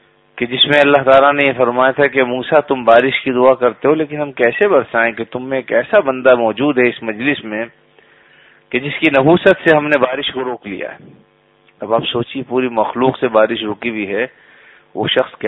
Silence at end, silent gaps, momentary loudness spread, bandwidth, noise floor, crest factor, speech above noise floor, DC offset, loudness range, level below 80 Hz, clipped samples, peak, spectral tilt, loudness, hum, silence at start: 0 s; none; 12 LU; 6 kHz; -53 dBFS; 14 dB; 39 dB; under 0.1%; 6 LU; -54 dBFS; under 0.1%; 0 dBFS; -7 dB/octave; -14 LUFS; none; 0.35 s